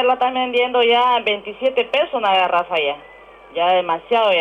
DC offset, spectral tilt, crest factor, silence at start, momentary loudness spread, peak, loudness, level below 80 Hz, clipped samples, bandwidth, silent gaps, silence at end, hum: under 0.1%; -4.5 dB/octave; 10 dB; 0 s; 6 LU; -8 dBFS; -17 LUFS; -60 dBFS; under 0.1%; 6.8 kHz; none; 0 s; none